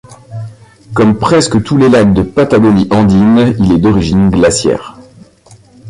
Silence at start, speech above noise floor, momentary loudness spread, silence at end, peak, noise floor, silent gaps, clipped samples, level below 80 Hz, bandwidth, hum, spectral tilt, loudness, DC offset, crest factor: 0.1 s; 33 dB; 15 LU; 0 s; 0 dBFS; -41 dBFS; none; under 0.1%; -32 dBFS; 11 kHz; none; -6 dB/octave; -9 LUFS; under 0.1%; 10 dB